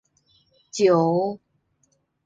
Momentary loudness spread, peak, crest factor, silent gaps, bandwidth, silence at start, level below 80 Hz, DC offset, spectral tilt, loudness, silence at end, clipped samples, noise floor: 18 LU; -8 dBFS; 18 dB; none; 9.2 kHz; 0.75 s; -72 dBFS; under 0.1%; -6 dB/octave; -21 LUFS; 0.9 s; under 0.1%; -69 dBFS